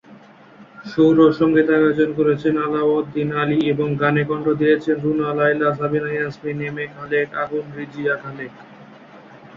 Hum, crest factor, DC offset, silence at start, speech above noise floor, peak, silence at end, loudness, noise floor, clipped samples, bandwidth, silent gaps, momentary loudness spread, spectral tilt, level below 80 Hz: none; 18 dB; under 0.1%; 0.1 s; 27 dB; -2 dBFS; 0 s; -19 LUFS; -45 dBFS; under 0.1%; 6.8 kHz; none; 12 LU; -8.5 dB/octave; -56 dBFS